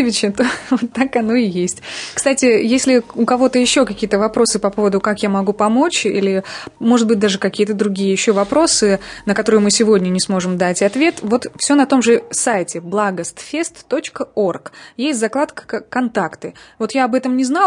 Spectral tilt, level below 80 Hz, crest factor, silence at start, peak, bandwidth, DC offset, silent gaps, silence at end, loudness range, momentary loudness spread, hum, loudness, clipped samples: -4 dB/octave; -52 dBFS; 14 dB; 0 s; -2 dBFS; 11 kHz; under 0.1%; none; 0 s; 6 LU; 10 LU; none; -16 LUFS; under 0.1%